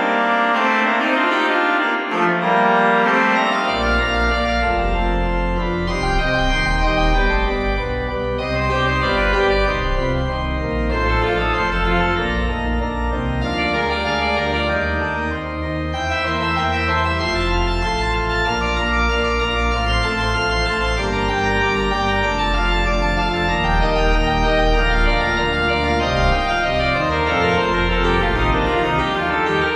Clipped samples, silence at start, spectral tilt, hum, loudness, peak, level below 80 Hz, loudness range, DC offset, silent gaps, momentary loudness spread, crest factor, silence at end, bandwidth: under 0.1%; 0 s; -5.5 dB/octave; none; -18 LUFS; -4 dBFS; -24 dBFS; 3 LU; under 0.1%; none; 5 LU; 14 dB; 0 s; 10 kHz